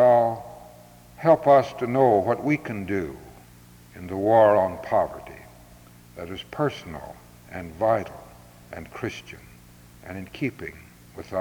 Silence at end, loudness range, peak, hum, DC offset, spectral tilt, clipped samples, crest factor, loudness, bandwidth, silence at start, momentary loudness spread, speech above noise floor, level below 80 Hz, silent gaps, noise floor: 0 s; 9 LU; -6 dBFS; none; under 0.1%; -7 dB/octave; under 0.1%; 18 dB; -23 LUFS; over 20 kHz; 0 s; 25 LU; 26 dB; -56 dBFS; none; -49 dBFS